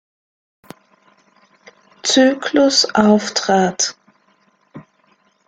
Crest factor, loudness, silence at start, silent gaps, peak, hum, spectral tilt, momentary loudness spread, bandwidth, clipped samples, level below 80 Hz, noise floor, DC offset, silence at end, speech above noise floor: 18 dB; -15 LUFS; 2.05 s; none; 0 dBFS; none; -3 dB/octave; 7 LU; 9.4 kHz; under 0.1%; -60 dBFS; -59 dBFS; under 0.1%; 0.7 s; 44 dB